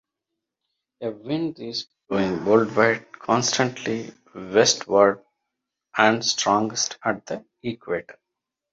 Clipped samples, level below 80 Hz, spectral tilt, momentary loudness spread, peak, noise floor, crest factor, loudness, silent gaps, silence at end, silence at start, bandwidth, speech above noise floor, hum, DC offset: under 0.1%; -62 dBFS; -3 dB/octave; 15 LU; -2 dBFS; -83 dBFS; 22 dB; -22 LUFS; none; 0.6 s; 1 s; 8 kHz; 61 dB; none; under 0.1%